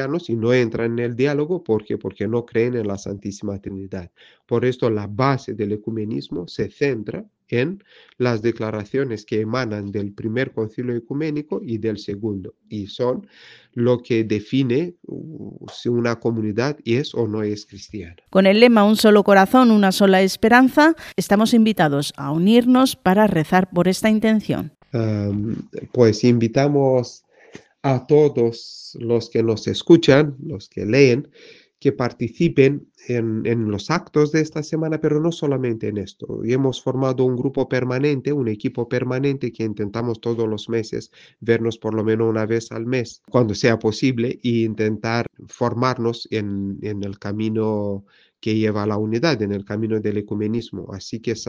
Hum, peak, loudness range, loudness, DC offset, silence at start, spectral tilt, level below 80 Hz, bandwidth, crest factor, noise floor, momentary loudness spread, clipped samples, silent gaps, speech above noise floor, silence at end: none; 0 dBFS; 9 LU; -20 LUFS; under 0.1%; 0 s; -6.5 dB/octave; -56 dBFS; 15.5 kHz; 20 dB; -46 dBFS; 14 LU; under 0.1%; none; 26 dB; 0.05 s